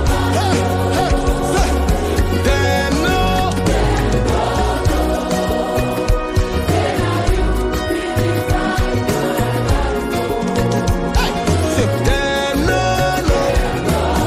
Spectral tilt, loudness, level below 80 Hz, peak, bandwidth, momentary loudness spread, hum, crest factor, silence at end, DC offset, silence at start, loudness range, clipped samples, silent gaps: -5.5 dB/octave; -17 LUFS; -22 dBFS; -2 dBFS; 16 kHz; 3 LU; none; 14 dB; 0 s; under 0.1%; 0 s; 2 LU; under 0.1%; none